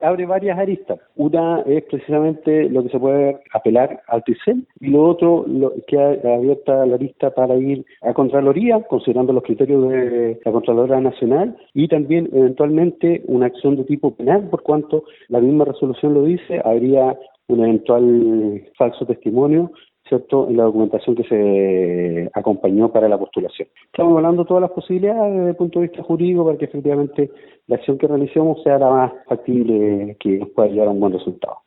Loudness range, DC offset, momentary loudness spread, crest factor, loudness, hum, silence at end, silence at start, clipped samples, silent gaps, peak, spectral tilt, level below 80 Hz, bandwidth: 2 LU; under 0.1%; 7 LU; 16 dB; -17 LUFS; none; 0.1 s; 0 s; under 0.1%; none; -2 dBFS; -13 dB/octave; -60 dBFS; 4.1 kHz